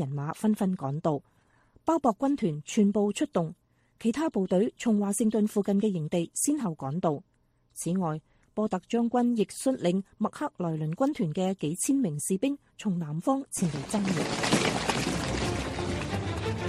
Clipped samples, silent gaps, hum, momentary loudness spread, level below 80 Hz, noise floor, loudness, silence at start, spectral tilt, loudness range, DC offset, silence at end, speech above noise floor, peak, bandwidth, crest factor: under 0.1%; none; none; 6 LU; -52 dBFS; -63 dBFS; -29 LUFS; 0 s; -5.5 dB/octave; 2 LU; under 0.1%; 0 s; 35 dB; -12 dBFS; 15 kHz; 18 dB